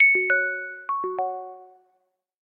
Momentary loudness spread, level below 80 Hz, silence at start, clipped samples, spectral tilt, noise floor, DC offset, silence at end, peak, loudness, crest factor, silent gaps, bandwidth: 16 LU; -86 dBFS; 0 s; under 0.1%; -7 dB/octave; -72 dBFS; under 0.1%; 0.85 s; -8 dBFS; -23 LUFS; 16 dB; none; 3.6 kHz